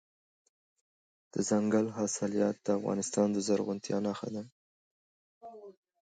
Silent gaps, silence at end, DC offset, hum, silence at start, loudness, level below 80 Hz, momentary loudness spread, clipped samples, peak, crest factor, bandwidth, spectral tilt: 4.52-5.41 s; 0.3 s; under 0.1%; none; 1.35 s; -32 LUFS; -74 dBFS; 21 LU; under 0.1%; -16 dBFS; 18 dB; 9.4 kHz; -5 dB/octave